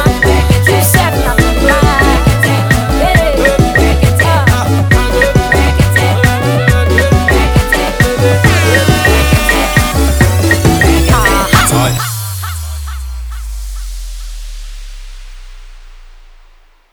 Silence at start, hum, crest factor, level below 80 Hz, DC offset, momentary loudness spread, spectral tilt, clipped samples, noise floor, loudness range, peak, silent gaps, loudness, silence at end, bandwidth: 0 s; none; 10 dB; -16 dBFS; under 0.1%; 16 LU; -5 dB/octave; 0.1%; -43 dBFS; 15 LU; 0 dBFS; none; -9 LUFS; 0.85 s; over 20 kHz